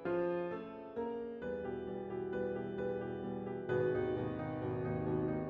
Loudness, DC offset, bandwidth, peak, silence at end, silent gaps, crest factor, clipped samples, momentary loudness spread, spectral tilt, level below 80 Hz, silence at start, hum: -39 LUFS; under 0.1%; 4.9 kHz; -24 dBFS; 0 s; none; 14 dB; under 0.1%; 7 LU; -7.5 dB/octave; -62 dBFS; 0 s; none